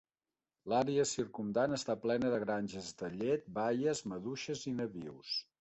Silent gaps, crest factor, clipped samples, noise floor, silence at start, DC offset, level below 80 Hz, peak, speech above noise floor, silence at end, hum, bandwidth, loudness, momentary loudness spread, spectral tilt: none; 16 dB; under 0.1%; under -90 dBFS; 0.65 s; under 0.1%; -70 dBFS; -20 dBFS; over 54 dB; 0.2 s; none; 8.2 kHz; -36 LUFS; 9 LU; -4.5 dB/octave